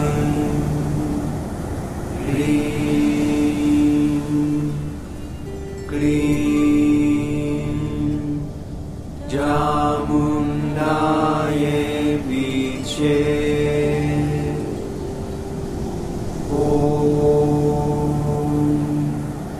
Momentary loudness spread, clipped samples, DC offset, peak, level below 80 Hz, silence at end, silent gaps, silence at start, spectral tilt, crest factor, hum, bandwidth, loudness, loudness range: 11 LU; under 0.1%; under 0.1%; -6 dBFS; -34 dBFS; 0 s; none; 0 s; -7 dB/octave; 14 dB; none; 14.5 kHz; -20 LUFS; 2 LU